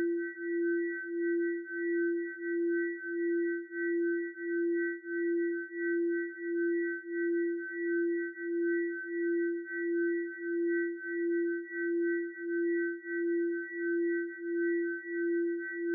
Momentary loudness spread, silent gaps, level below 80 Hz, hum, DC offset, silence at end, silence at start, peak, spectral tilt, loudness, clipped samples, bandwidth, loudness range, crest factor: 4 LU; none; under -90 dBFS; none; under 0.1%; 0 s; 0 s; -24 dBFS; 1 dB/octave; -33 LUFS; under 0.1%; 2.1 kHz; 1 LU; 10 dB